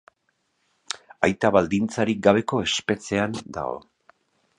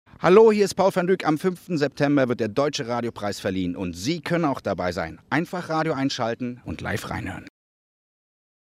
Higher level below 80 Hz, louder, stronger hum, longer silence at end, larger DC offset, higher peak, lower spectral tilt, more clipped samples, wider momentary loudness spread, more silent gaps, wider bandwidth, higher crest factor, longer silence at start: about the same, -54 dBFS vs -58 dBFS; about the same, -23 LUFS vs -23 LUFS; neither; second, 0.8 s vs 1.3 s; neither; about the same, -2 dBFS vs -2 dBFS; about the same, -5 dB/octave vs -6 dB/octave; neither; about the same, 15 LU vs 13 LU; neither; second, 11 kHz vs 15.5 kHz; about the same, 24 dB vs 20 dB; first, 0.95 s vs 0.2 s